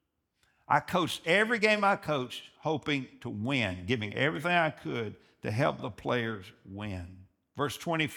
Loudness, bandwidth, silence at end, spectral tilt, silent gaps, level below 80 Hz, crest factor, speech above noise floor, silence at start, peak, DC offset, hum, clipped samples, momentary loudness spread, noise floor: -30 LUFS; over 20 kHz; 0 s; -5 dB/octave; none; -66 dBFS; 22 dB; 44 dB; 0.7 s; -10 dBFS; under 0.1%; none; under 0.1%; 15 LU; -74 dBFS